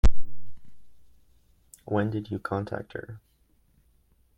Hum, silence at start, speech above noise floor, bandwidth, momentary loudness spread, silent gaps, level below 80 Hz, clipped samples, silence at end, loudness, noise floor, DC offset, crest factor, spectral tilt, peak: none; 0.05 s; 34 dB; 8.2 kHz; 24 LU; none; -34 dBFS; under 0.1%; 1.2 s; -31 LUFS; -65 dBFS; under 0.1%; 18 dB; -7.5 dB/octave; -6 dBFS